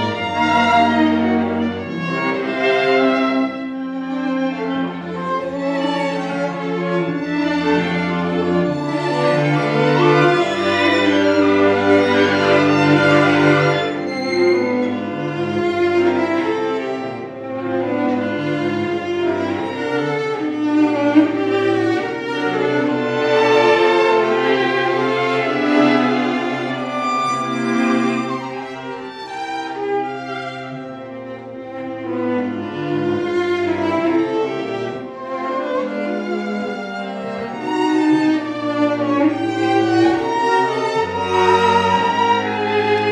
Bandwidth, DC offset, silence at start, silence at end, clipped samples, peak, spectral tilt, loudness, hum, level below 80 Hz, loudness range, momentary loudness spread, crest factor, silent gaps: 10 kHz; under 0.1%; 0 s; 0 s; under 0.1%; 0 dBFS; -6 dB/octave; -18 LUFS; none; -60 dBFS; 8 LU; 12 LU; 16 dB; none